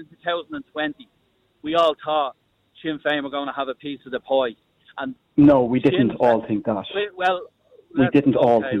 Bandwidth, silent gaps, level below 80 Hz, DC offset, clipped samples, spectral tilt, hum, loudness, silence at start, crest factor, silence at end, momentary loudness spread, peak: 6.2 kHz; none; -54 dBFS; under 0.1%; under 0.1%; -8 dB/octave; none; -21 LUFS; 0 s; 18 dB; 0 s; 15 LU; -4 dBFS